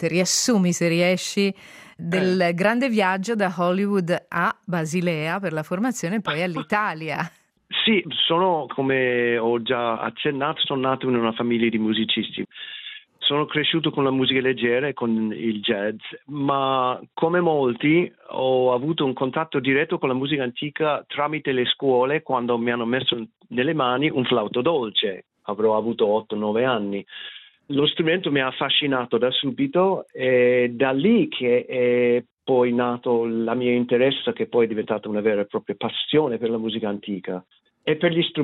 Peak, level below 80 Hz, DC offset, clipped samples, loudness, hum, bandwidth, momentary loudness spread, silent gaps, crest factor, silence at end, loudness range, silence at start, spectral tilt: -6 dBFS; -68 dBFS; under 0.1%; under 0.1%; -22 LUFS; none; 15 kHz; 8 LU; 32.33-32.37 s; 16 dB; 0 s; 3 LU; 0 s; -4.5 dB/octave